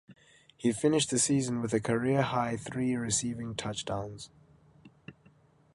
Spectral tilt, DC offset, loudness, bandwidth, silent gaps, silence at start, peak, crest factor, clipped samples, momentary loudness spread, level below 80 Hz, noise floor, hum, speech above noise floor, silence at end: -4.5 dB/octave; under 0.1%; -30 LUFS; 11.5 kHz; none; 0.1 s; -12 dBFS; 20 dB; under 0.1%; 10 LU; -62 dBFS; -62 dBFS; none; 32 dB; 0.65 s